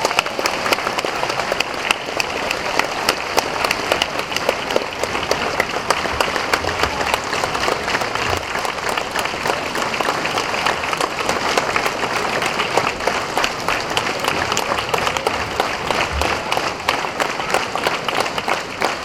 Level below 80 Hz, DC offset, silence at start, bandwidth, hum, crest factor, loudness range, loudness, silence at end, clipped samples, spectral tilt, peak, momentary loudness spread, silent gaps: -42 dBFS; 0.1%; 0 s; 19 kHz; none; 20 dB; 1 LU; -19 LUFS; 0 s; under 0.1%; -2.5 dB/octave; 0 dBFS; 3 LU; none